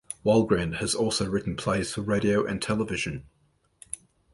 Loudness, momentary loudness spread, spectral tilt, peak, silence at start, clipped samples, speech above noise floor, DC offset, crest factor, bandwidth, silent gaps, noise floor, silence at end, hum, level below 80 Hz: -26 LUFS; 16 LU; -5 dB/octave; -10 dBFS; 0.1 s; under 0.1%; 31 dB; under 0.1%; 18 dB; 11.5 kHz; none; -56 dBFS; 0.35 s; none; -50 dBFS